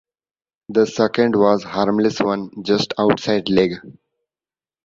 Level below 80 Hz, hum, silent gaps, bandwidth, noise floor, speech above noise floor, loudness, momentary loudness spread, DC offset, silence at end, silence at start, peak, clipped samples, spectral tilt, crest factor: -54 dBFS; none; none; 7.6 kHz; under -90 dBFS; over 72 dB; -18 LUFS; 6 LU; under 0.1%; 0.95 s; 0.7 s; -2 dBFS; under 0.1%; -6 dB/octave; 18 dB